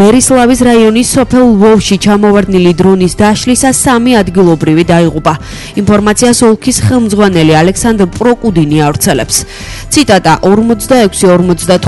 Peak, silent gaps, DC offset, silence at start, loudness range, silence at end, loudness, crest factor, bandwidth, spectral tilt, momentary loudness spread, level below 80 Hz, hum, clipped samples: 0 dBFS; none; under 0.1%; 0 s; 2 LU; 0 s; -7 LUFS; 6 dB; 12 kHz; -5 dB/octave; 4 LU; -28 dBFS; none; 1%